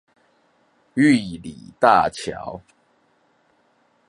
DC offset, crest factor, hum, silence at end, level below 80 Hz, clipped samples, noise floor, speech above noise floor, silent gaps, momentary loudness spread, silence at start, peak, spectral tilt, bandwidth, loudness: under 0.1%; 22 dB; none; 1.5 s; -56 dBFS; under 0.1%; -62 dBFS; 43 dB; none; 20 LU; 0.95 s; -2 dBFS; -5.5 dB/octave; 11.5 kHz; -19 LUFS